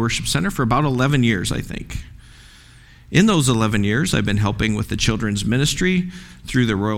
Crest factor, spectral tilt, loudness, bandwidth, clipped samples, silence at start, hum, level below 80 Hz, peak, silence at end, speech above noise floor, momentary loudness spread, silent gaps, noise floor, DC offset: 20 dB; -5 dB/octave; -19 LUFS; 17 kHz; under 0.1%; 0 s; none; -36 dBFS; 0 dBFS; 0 s; 27 dB; 11 LU; none; -46 dBFS; under 0.1%